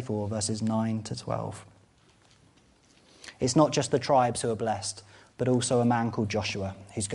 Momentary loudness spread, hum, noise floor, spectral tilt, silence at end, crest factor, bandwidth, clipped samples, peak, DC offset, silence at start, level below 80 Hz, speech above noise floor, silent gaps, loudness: 12 LU; none; -61 dBFS; -5 dB/octave; 0 s; 22 dB; 11.5 kHz; under 0.1%; -8 dBFS; under 0.1%; 0 s; -60 dBFS; 33 dB; none; -28 LUFS